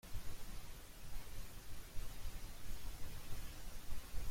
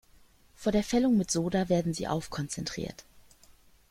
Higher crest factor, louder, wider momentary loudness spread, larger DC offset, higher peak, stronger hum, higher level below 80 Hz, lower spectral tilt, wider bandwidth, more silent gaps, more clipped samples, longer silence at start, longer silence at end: second, 12 dB vs 18 dB; second, -53 LUFS vs -30 LUFS; second, 3 LU vs 10 LU; neither; second, -28 dBFS vs -14 dBFS; neither; about the same, -48 dBFS vs -52 dBFS; second, -3.5 dB/octave vs -5.5 dB/octave; about the same, 16.5 kHz vs 16 kHz; neither; neither; second, 0.05 s vs 0.6 s; second, 0 s vs 0.7 s